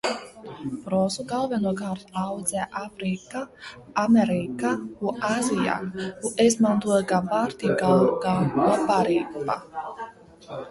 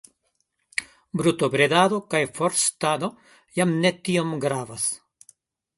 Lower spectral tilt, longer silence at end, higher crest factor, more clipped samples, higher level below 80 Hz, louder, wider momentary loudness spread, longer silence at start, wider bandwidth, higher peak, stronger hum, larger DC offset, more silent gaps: first, -5.5 dB/octave vs -4 dB/octave; second, 0 s vs 0.8 s; about the same, 18 dB vs 22 dB; neither; first, -58 dBFS vs -64 dBFS; about the same, -24 LUFS vs -23 LUFS; first, 15 LU vs 12 LU; second, 0.05 s vs 0.8 s; about the same, 12 kHz vs 12 kHz; second, -8 dBFS vs -4 dBFS; neither; neither; neither